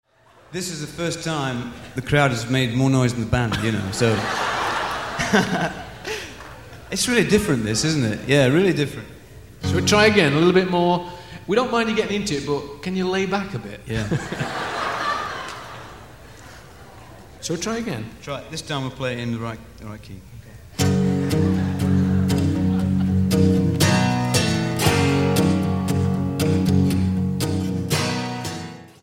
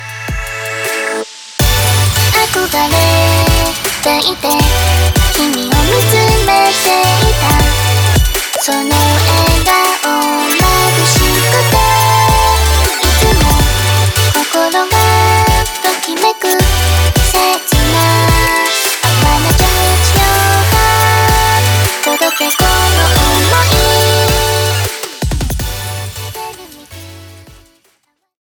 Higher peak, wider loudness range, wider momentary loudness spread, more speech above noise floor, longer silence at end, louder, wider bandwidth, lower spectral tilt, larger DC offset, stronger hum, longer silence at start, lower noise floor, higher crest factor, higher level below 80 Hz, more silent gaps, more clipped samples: about the same, -2 dBFS vs 0 dBFS; first, 10 LU vs 3 LU; first, 15 LU vs 8 LU; second, 22 dB vs 49 dB; second, 0.15 s vs 1 s; second, -21 LUFS vs -10 LUFS; second, 16.5 kHz vs over 20 kHz; first, -5.5 dB/octave vs -3.5 dB/octave; first, 0.2% vs under 0.1%; neither; first, 0.5 s vs 0 s; second, -43 dBFS vs -59 dBFS; first, 20 dB vs 10 dB; second, -44 dBFS vs -18 dBFS; neither; neither